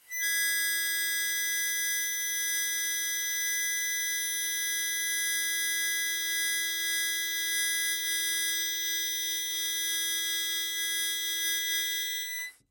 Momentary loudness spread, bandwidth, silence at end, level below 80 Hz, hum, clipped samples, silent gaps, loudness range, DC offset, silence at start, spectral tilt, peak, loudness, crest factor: 2 LU; 17 kHz; 0.2 s; -86 dBFS; none; under 0.1%; none; 1 LU; under 0.1%; 0.1 s; 4.5 dB/octave; -18 dBFS; -28 LUFS; 14 dB